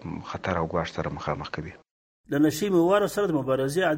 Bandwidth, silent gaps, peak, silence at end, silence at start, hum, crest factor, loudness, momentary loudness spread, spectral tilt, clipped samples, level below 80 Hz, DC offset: 16.5 kHz; 1.91-2.24 s; -10 dBFS; 0 s; 0 s; none; 16 dB; -26 LUFS; 13 LU; -6 dB/octave; under 0.1%; -52 dBFS; under 0.1%